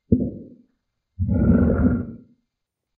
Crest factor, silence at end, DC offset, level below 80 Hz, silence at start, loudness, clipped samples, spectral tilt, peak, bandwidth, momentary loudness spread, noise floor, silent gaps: 20 dB; 0.8 s; under 0.1%; -32 dBFS; 0.1 s; -21 LUFS; under 0.1%; -14 dB/octave; -2 dBFS; 2.5 kHz; 15 LU; -81 dBFS; none